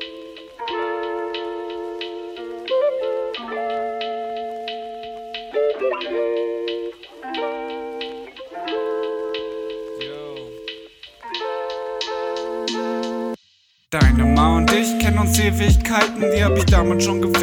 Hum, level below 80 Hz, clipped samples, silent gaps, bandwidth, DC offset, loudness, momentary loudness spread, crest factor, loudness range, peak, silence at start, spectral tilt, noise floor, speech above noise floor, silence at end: none; -28 dBFS; under 0.1%; none; over 20 kHz; under 0.1%; -22 LUFS; 16 LU; 20 dB; 11 LU; -2 dBFS; 0 s; -5 dB/octave; -59 dBFS; 44 dB; 0 s